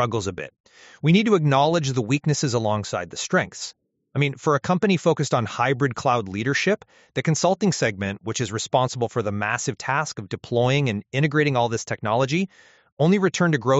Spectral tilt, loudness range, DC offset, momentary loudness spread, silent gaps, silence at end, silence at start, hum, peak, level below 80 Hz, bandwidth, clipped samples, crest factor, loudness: -5 dB/octave; 2 LU; under 0.1%; 9 LU; 0.60-0.64 s, 12.92-12.97 s; 0 s; 0 s; none; -4 dBFS; -60 dBFS; 8 kHz; under 0.1%; 18 dB; -22 LUFS